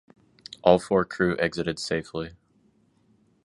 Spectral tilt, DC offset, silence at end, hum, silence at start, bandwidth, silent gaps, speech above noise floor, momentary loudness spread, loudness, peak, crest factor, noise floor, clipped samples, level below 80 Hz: -5.5 dB/octave; under 0.1%; 1.15 s; none; 0.65 s; 11.5 kHz; none; 40 dB; 14 LU; -25 LUFS; -4 dBFS; 24 dB; -64 dBFS; under 0.1%; -54 dBFS